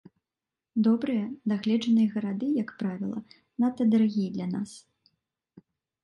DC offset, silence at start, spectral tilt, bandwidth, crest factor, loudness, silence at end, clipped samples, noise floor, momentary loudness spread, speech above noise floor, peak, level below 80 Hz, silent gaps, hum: under 0.1%; 0.75 s; -7.5 dB/octave; 10.5 kHz; 14 dB; -27 LUFS; 1.25 s; under 0.1%; -90 dBFS; 11 LU; 63 dB; -14 dBFS; -72 dBFS; none; none